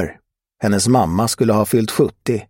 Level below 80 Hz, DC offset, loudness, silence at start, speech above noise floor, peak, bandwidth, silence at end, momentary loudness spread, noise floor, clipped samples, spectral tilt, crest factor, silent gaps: -44 dBFS; under 0.1%; -17 LUFS; 0 s; 31 dB; -2 dBFS; 16.5 kHz; 0.05 s; 6 LU; -48 dBFS; under 0.1%; -5.5 dB/octave; 16 dB; none